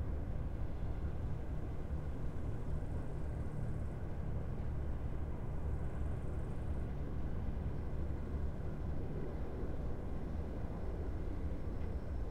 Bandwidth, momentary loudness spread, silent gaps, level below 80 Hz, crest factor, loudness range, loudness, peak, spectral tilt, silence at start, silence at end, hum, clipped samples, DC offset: 5.6 kHz; 2 LU; none; -42 dBFS; 12 dB; 1 LU; -43 LUFS; -26 dBFS; -9 dB/octave; 0 s; 0 s; none; under 0.1%; under 0.1%